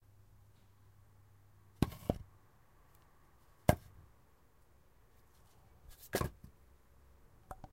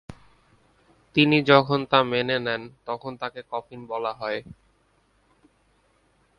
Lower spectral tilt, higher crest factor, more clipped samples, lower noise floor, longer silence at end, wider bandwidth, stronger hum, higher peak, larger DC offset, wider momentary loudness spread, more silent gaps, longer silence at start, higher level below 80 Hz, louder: about the same, -6 dB/octave vs -7 dB/octave; first, 36 dB vs 26 dB; neither; about the same, -68 dBFS vs -65 dBFS; second, 0.05 s vs 1.85 s; first, 16 kHz vs 10 kHz; neither; second, -8 dBFS vs -2 dBFS; neither; first, 27 LU vs 16 LU; neither; first, 1.8 s vs 0.1 s; first, -56 dBFS vs -62 dBFS; second, -39 LUFS vs -24 LUFS